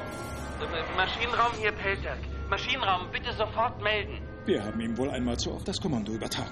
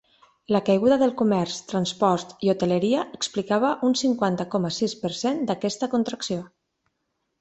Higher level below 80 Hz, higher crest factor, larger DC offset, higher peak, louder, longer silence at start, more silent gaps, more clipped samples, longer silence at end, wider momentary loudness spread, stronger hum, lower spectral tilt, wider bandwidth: first, -42 dBFS vs -64 dBFS; about the same, 20 dB vs 18 dB; neither; second, -10 dBFS vs -6 dBFS; second, -30 LUFS vs -24 LUFS; second, 0 s vs 0.5 s; neither; neither; second, 0 s vs 0.95 s; about the same, 9 LU vs 7 LU; neither; about the same, -4.5 dB/octave vs -5.5 dB/octave; first, 12.5 kHz vs 8.4 kHz